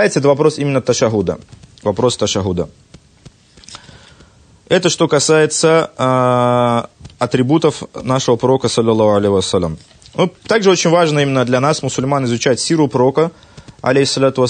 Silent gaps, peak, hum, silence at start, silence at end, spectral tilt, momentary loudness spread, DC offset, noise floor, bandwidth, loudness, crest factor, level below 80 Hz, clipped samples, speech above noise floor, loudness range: none; 0 dBFS; none; 0 s; 0 s; -5 dB/octave; 10 LU; under 0.1%; -46 dBFS; 9.6 kHz; -14 LUFS; 14 dB; -48 dBFS; under 0.1%; 32 dB; 6 LU